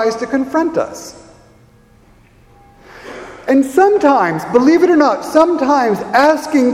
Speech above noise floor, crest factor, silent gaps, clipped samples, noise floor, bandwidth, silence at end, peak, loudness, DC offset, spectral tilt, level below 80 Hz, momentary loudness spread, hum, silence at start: 34 dB; 14 dB; none; under 0.1%; -47 dBFS; 15.5 kHz; 0 s; 0 dBFS; -13 LUFS; under 0.1%; -5 dB/octave; -52 dBFS; 18 LU; none; 0 s